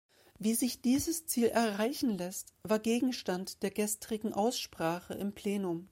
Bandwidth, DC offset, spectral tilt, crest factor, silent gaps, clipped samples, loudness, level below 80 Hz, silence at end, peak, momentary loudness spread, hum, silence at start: 16 kHz; under 0.1%; -4 dB/octave; 16 dB; none; under 0.1%; -33 LUFS; -66 dBFS; 0.05 s; -16 dBFS; 7 LU; none; 0.4 s